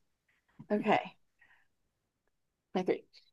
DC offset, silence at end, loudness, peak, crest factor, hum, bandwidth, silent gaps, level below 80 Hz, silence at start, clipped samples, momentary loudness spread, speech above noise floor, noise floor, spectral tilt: under 0.1%; 0.35 s; -34 LUFS; -14 dBFS; 24 dB; none; 7.8 kHz; none; -82 dBFS; 0.6 s; under 0.1%; 9 LU; 50 dB; -82 dBFS; -7 dB/octave